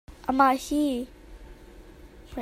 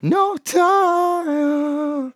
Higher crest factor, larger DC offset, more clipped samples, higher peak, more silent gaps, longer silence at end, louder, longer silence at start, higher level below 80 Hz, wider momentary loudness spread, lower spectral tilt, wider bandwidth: first, 22 dB vs 14 dB; neither; neither; about the same, -6 dBFS vs -4 dBFS; neither; about the same, 0 s vs 0.05 s; second, -25 LUFS vs -18 LUFS; about the same, 0.1 s vs 0.05 s; first, -48 dBFS vs -76 dBFS; first, 18 LU vs 6 LU; about the same, -4.5 dB/octave vs -5.5 dB/octave; about the same, 16 kHz vs 16 kHz